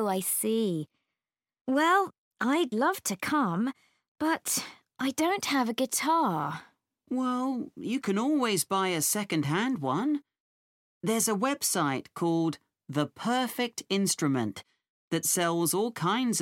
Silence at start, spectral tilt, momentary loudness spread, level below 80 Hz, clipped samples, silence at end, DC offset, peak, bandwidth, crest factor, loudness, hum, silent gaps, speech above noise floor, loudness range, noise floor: 0 s; -3.5 dB/octave; 8 LU; -76 dBFS; under 0.1%; 0 s; under 0.1%; -12 dBFS; 17 kHz; 18 dB; -29 LUFS; none; 1.61-1.65 s, 2.18-2.31 s, 4.08-4.15 s, 10.40-11.01 s, 14.89-15.11 s; over 62 dB; 1 LU; under -90 dBFS